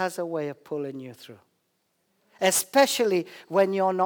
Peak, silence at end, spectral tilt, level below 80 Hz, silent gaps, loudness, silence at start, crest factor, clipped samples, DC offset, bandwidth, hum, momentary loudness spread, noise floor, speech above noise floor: -6 dBFS; 0 s; -3 dB/octave; -82 dBFS; none; -25 LUFS; 0 s; 20 dB; under 0.1%; under 0.1%; over 20 kHz; none; 14 LU; -73 dBFS; 48 dB